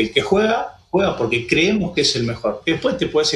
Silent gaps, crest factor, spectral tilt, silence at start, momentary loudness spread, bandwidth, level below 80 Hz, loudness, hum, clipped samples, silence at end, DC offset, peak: none; 18 dB; -4.5 dB/octave; 0 s; 6 LU; 12 kHz; -46 dBFS; -19 LUFS; none; under 0.1%; 0 s; under 0.1%; -2 dBFS